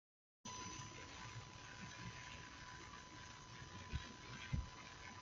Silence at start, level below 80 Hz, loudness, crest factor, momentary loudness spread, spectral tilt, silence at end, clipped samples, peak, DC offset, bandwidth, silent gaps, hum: 0.45 s; -60 dBFS; -52 LUFS; 24 dB; 8 LU; -3.5 dB/octave; 0 s; under 0.1%; -30 dBFS; under 0.1%; 7.8 kHz; none; none